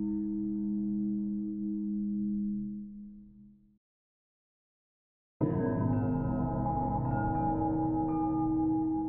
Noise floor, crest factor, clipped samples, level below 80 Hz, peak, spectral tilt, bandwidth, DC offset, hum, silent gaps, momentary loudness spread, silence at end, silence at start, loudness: -56 dBFS; 16 dB; under 0.1%; -48 dBFS; -16 dBFS; -12.5 dB/octave; 2.8 kHz; under 0.1%; none; 3.77-5.40 s; 5 LU; 0 s; 0 s; -32 LUFS